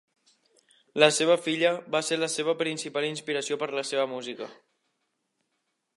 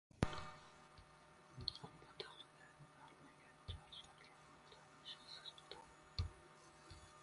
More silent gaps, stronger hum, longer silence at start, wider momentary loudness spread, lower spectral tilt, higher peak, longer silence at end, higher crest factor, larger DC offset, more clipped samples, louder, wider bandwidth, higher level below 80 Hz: neither; neither; first, 0.95 s vs 0.15 s; about the same, 14 LU vs 16 LU; second, -3 dB/octave vs -5 dB/octave; first, -2 dBFS vs -20 dBFS; first, 1.45 s vs 0 s; second, 26 dB vs 34 dB; neither; neither; first, -26 LUFS vs -53 LUFS; about the same, 11.5 kHz vs 11.5 kHz; second, -84 dBFS vs -62 dBFS